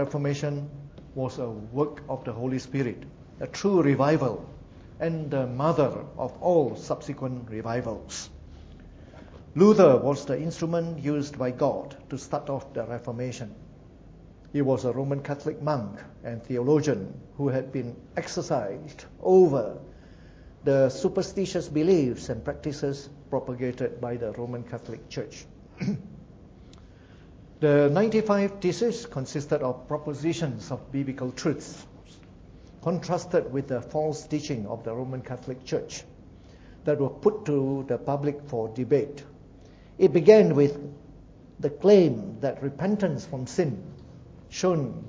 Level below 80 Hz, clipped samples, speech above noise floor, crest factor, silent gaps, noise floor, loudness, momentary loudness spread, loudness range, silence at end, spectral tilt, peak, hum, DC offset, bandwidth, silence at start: -54 dBFS; under 0.1%; 24 dB; 24 dB; none; -50 dBFS; -26 LUFS; 17 LU; 9 LU; 0 s; -7 dB/octave; -2 dBFS; none; under 0.1%; 8 kHz; 0 s